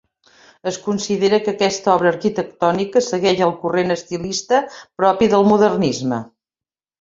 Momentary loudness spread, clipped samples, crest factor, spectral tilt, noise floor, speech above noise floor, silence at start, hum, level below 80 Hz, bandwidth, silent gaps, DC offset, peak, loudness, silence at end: 9 LU; under 0.1%; 16 dB; -5 dB/octave; under -90 dBFS; over 73 dB; 0.65 s; none; -56 dBFS; 7.8 kHz; none; under 0.1%; -2 dBFS; -18 LUFS; 0.75 s